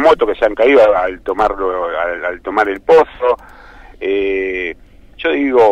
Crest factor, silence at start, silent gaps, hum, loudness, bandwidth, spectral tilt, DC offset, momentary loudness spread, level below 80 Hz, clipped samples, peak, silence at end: 12 dB; 0 s; none; none; -15 LUFS; 8.4 kHz; -5.5 dB/octave; under 0.1%; 11 LU; -40 dBFS; under 0.1%; -2 dBFS; 0 s